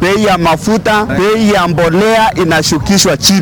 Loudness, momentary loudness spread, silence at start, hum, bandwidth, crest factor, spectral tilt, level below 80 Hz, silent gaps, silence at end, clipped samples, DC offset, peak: -10 LUFS; 3 LU; 0 s; none; 19 kHz; 10 dB; -4 dB/octave; -32 dBFS; none; 0 s; under 0.1%; under 0.1%; 0 dBFS